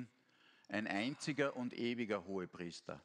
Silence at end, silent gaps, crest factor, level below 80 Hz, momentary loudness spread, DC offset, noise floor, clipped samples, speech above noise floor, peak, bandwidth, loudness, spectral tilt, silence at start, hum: 0.05 s; none; 20 dB; -82 dBFS; 9 LU; under 0.1%; -71 dBFS; under 0.1%; 29 dB; -22 dBFS; 11 kHz; -41 LUFS; -5 dB/octave; 0 s; none